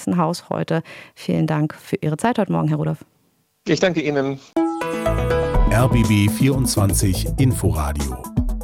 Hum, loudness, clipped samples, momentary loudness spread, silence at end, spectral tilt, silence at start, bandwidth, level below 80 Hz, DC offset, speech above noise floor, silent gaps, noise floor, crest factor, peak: none; -20 LUFS; under 0.1%; 8 LU; 0 s; -6 dB/octave; 0 s; 17.5 kHz; -28 dBFS; under 0.1%; 44 dB; none; -63 dBFS; 16 dB; -4 dBFS